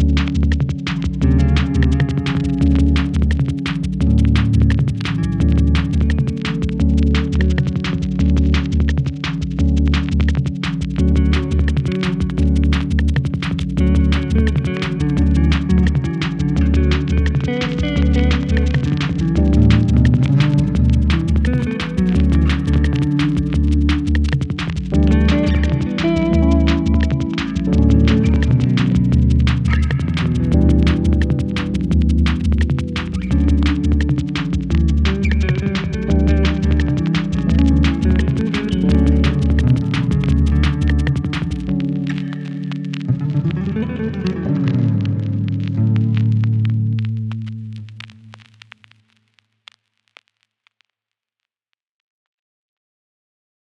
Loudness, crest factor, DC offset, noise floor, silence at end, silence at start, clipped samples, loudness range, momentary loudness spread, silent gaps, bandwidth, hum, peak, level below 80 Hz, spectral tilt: -17 LUFS; 14 dB; under 0.1%; -83 dBFS; 5.45 s; 0 s; under 0.1%; 4 LU; 7 LU; none; 8.6 kHz; none; 0 dBFS; -22 dBFS; -7.5 dB/octave